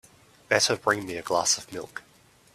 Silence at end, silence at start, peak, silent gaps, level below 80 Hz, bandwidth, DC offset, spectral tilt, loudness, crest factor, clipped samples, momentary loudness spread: 0.55 s; 0.5 s; -4 dBFS; none; -66 dBFS; 15.5 kHz; under 0.1%; -1.5 dB/octave; -25 LUFS; 24 dB; under 0.1%; 16 LU